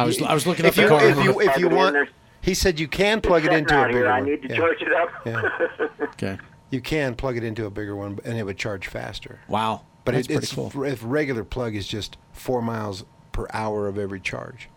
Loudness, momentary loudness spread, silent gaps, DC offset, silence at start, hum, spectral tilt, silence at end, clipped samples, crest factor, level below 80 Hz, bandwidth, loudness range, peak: -22 LUFS; 13 LU; none; under 0.1%; 0 s; none; -5 dB/octave; 0.1 s; under 0.1%; 20 dB; -42 dBFS; 17.5 kHz; 10 LU; -2 dBFS